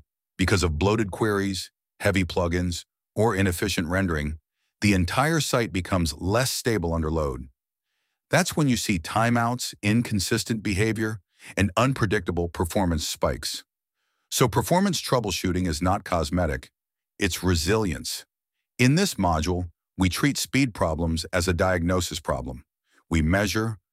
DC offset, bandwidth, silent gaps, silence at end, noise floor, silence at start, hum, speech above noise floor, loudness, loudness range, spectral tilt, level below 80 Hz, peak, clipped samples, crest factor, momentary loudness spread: under 0.1%; 16 kHz; none; 0.15 s; -85 dBFS; 0.4 s; none; 61 dB; -25 LUFS; 2 LU; -5 dB/octave; -40 dBFS; -6 dBFS; under 0.1%; 20 dB; 8 LU